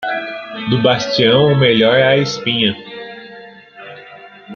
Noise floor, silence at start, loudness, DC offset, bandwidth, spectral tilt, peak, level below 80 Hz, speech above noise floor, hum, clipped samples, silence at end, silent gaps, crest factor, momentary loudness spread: -38 dBFS; 0 s; -13 LUFS; under 0.1%; 7.2 kHz; -5.5 dB/octave; 0 dBFS; -56 dBFS; 25 dB; none; under 0.1%; 0 s; none; 16 dB; 23 LU